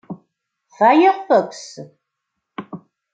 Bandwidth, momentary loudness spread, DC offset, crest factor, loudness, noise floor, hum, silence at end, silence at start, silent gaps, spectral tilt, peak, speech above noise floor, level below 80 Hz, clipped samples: 9 kHz; 25 LU; under 0.1%; 18 dB; -15 LUFS; -78 dBFS; none; 0.35 s; 0.1 s; none; -5.5 dB/octave; -2 dBFS; 62 dB; -74 dBFS; under 0.1%